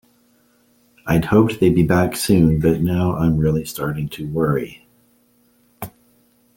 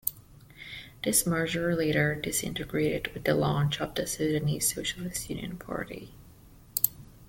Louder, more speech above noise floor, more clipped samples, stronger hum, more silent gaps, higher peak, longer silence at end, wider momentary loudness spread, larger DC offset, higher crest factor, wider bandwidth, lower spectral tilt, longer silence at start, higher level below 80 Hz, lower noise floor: first, -18 LUFS vs -29 LUFS; first, 41 dB vs 24 dB; neither; neither; neither; about the same, -2 dBFS vs 0 dBFS; first, 0.65 s vs 0.05 s; first, 20 LU vs 11 LU; neither; second, 18 dB vs 30 dB; about the same, 17 kHz vs 17 kHz; first, -7 dB/octave vs -4 dB/octave; first, 1.05 s vs 0.05 s; first, -40 dBFS vs -52 dBFS; first, -58 dBFS vs -53 dBFS